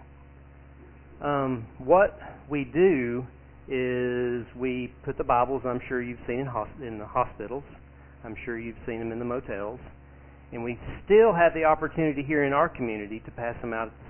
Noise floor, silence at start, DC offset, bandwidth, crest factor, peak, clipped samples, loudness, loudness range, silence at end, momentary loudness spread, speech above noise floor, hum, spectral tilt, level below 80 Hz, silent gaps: -50 dBFS; 0 s; under 0.1%; 3.3 kHz; 20 dB; -8 dBFS; under 0.1%; -27 LUFS; 9 LU; 0 s; 16 LU; 23 dB; none; -10.5 dB/octave; -50 dBFS; none